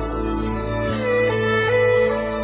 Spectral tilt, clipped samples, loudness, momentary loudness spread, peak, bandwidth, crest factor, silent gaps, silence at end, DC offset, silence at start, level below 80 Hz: -10 dB/octave; under 0.1%; -20 LUFS; 7 LU; -8 dBFS; 4 kHz; 12 dB; none; 0 s; under 0.1%; 0 s; -34 dBFS